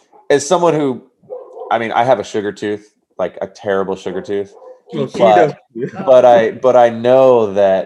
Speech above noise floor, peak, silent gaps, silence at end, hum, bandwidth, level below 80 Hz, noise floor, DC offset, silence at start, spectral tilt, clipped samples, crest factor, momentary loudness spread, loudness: 19 dB; 0 dBFS; none; 0 s; none; 11.5 kHz; -66 dBFS; -32 dBFS; under 0.1%; 0.3 s; -5.5 dB/octave; 0.1%; 14 dB; 17 LU; -14 LUFS